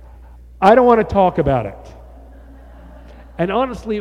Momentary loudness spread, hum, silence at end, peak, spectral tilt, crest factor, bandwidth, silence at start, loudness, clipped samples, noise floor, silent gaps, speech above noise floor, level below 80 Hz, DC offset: 12 LU; none; 0 s; 0 dBFS; -8 dB/octave; 18 dB; 10.5 kHz; 0.6 s; -15 LUFS; under 0.1%; -40 dBFS; none; 25 dB; -38 dBFS; under 0.1%